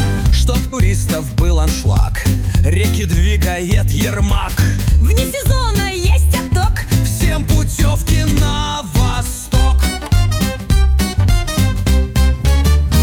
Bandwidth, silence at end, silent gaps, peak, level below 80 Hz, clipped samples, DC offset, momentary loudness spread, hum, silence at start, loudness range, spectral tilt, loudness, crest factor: 18.5 kHz; 0 s; none; -2 dBFS; -16 dBFS; under 0.1%; under 0.1%; 3 LU; none; 0 s; 1 LU; -5 dB/octave; -15 LUFS; 10 dB